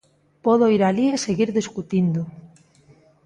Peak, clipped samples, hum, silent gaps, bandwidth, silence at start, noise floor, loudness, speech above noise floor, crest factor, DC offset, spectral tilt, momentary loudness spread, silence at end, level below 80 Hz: -6 dBFS; under 0.1%; none; none; 11 kHz; 0.45 s; -54 dBFS; -21 LUFS; 34 dB; 16 dB; under 0.1%; -6.5 dB/octave; 9 LU; 0.8 s; -60 dBFS